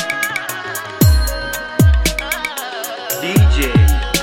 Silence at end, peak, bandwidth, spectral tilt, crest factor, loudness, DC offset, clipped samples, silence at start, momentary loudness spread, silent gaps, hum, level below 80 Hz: 0 s; 0 dBFS; 17 kHz; -4.5 dB/octave; 14 dB; -16 LUFS; under 0.1%; under 0.1%; 0 s; 10 LU; none; none; -20 dBFS